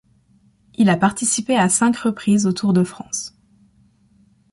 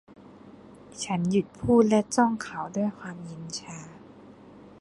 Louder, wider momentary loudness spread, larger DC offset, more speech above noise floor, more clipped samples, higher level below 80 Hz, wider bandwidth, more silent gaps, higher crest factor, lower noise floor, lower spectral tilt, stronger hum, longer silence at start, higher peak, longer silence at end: first, -18 LUFS vs -26 LUFS; second, 11 LU vs 20 LU; neither; first, 39 dB vs 23 dB; neither; about the same, -58 dBFS vs -58 dBFS; about the same, 11.5 kHz vs 11.5 kHz; neither; about the same, 16 dB vs 20 dB; first, -57 dBFS vs -49 dBFS; about the same, -4.5 dB/octave vs -5.5 dB/octave; neither; first, 0.8 s vs 0.1 s; first, -4 dBFS vs -8 dBFS; first, 1.25 s vs 0.1 s